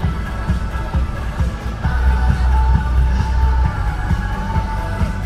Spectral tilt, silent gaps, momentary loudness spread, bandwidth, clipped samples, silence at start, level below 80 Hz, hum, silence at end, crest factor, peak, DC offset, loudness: -7 dB/octave; none; 6 LU; 9.2 kHz; under 0.1%; 0 s; -18 dBFS; none; 0 s; 14 dB; -2 dBFS; under 0.1%; -19 LUFS